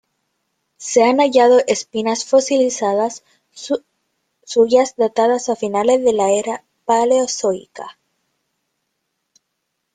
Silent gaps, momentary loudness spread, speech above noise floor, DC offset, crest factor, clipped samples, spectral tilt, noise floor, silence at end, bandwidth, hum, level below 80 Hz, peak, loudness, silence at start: none; 14 LU; 58 dB; under 0.1%; 16 dB; under 0.1%; -3 dB/octave; -74 dBFS; 2.05 s; 9.6 kHz; none; -64 dBFS; -2 dBFS; -16 LUFS; 0.8 s